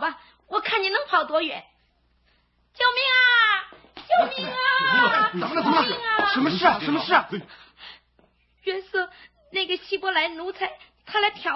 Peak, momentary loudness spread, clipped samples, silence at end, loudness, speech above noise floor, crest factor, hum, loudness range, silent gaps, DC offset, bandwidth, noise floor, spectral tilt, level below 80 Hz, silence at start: -4 dBFS; 13 LU; under 0.1%; 0 s; -22 LUFS; 41 dB; 20 dB; none; 8 LU; none; under 0.1%; 6 kHz; -65 dBFS; -5.5 dB/octave; -62 dBFS; 0 s